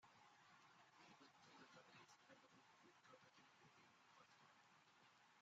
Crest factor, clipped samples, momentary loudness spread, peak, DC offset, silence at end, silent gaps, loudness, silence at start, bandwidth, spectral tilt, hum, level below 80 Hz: 18 dB; under 0.1%; 3 LU; -54 dBFS; under 0.1%; 0 s; none; -69 LUFS; 0 s; 7.6 kHz; -2 dB/octave; none; under -90 dBFS